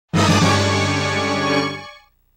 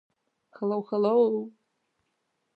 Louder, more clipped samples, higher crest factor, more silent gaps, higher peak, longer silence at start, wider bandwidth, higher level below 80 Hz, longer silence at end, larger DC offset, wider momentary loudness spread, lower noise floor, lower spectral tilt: first, -17 LUFS vs -26 LUFS; neither; second, 12 dB vs 18 dB; neither; first, -8 dBFS vs -12 dBFS; second, 0.15 s vs 0.6 s; first, 16 kHz vs 4.9 kHz; first, -48 dBFS vs -86 dBFS; second, 0.4 s vs 1.05 s; neither; second, 7 LU vs 11 LU; second, -44 dBFS vs -77 dBFS; second, -4.5 dB/octave vs -9.5 dB/octave